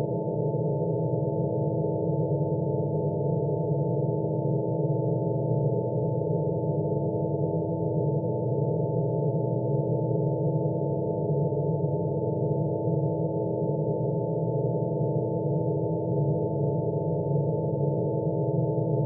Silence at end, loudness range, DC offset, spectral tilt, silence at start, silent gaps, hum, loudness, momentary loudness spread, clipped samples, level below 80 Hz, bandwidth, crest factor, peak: 0 s; 0 LU; under 0.1%; -6.5 dB/octave; 0 s; none; none; -27 LUFS; 1 LU; under 0.1%; -58 dBFS; 1 kHz; 12 dB; -14 dBFS